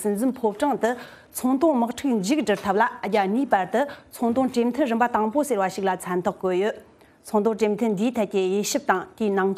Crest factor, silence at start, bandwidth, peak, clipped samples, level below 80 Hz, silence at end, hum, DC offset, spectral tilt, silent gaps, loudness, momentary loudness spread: 20 dB; 0 s; 15.5 kHz; -4 dBFS; under 0.1%; -62 dBFS; 0 s; none; under 0.1%; -5 dB/octave; none; -23 LUFS; 5 LU